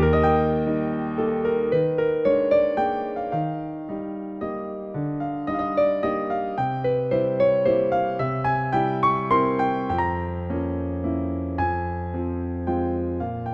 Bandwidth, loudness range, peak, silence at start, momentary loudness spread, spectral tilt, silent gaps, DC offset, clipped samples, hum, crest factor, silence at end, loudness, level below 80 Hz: 6 kHz; 5 LU; -8 dBFS; 0 s; 9 LU; -9.5 dB/octave; none; under 0.1%; under 0.1%; none; 14 dB; 0 s; -24 LUFS; -44 dBFS